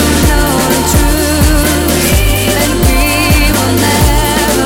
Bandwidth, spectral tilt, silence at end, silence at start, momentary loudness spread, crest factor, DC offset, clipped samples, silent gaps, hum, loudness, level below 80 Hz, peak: 18.5 kHz; -4 dB/octave; 0 s; 0 s; 1 LU; 10 dB; under 0.1%; under 0.1%; none; none; -10 LUFS; -14 dBFS; 0 dBFS